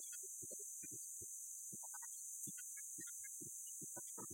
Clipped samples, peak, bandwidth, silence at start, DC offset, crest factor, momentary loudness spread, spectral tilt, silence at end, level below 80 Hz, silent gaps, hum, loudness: under 0.1%; -36 dBFS; 16.5 kHz; 0 s; under 0.1%; 16 dB; 1 LU; -1.5 dB/octave; 0 s; under -90 dBFS; none; none; -48 LUFS